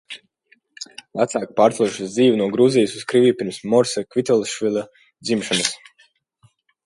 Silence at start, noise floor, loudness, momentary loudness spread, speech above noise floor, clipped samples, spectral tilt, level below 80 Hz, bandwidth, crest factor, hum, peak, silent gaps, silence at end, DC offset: 0.1 s; -60 dBFS; -19 LUFS; 19 LU; 42 dB; under 0.1%; -4.5 dB/octave; -66 dBFS; 11.5 kHz; 20 dB; none; -2 dBFS; none; 1.1 s; under 0.1%